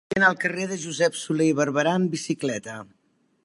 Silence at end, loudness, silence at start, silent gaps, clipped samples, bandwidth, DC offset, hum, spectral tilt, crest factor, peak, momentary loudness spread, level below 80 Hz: 0.6 s; -24 LUFS; 0.1 s; none; under 0.1%; 11.5 kHz; under 0.1%; none; -4.5 dB/octave; 20 dB; -6 dBFS; 10 LU; -66 dBFS